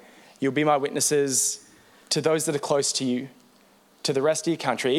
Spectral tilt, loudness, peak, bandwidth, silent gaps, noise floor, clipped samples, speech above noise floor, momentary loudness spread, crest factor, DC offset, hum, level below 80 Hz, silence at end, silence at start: -3 dB/octave; -24 LUFS; -8 dBFS; 16.5 kHz; none; -58 dBFS; under 0.1%; 34 dB; 8 LU; 18 dB; under 0.1%; none; -76 dBFS; 0 s; 0.4 s